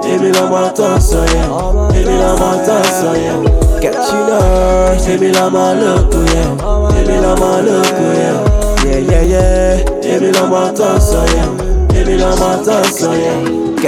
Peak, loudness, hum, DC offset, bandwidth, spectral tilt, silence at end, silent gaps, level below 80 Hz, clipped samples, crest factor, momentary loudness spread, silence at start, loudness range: 0 dBFS; -11 LUFS; none; under 0.1%; 16 kHz; -5.5 dB/octave; 0 s; none; -16 dBFS; under 0.1%; 10 dB; 3 LU; 0 s; 1 LU